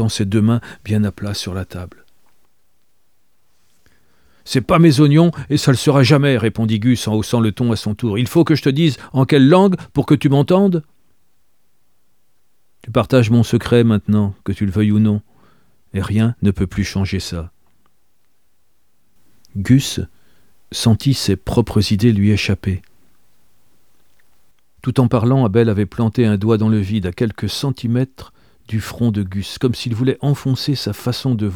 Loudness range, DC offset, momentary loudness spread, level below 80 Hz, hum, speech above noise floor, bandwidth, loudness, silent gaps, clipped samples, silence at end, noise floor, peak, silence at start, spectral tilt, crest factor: 8 LU; 0.3%; 12 LU; -42 dBFS; none; 52 dB; 17 kHz; -16 LUFS; none; under 0.1%; 0 s; -67 dBFS; 0 dBFS; 0 s; -6.5 dB/octave; 16 dB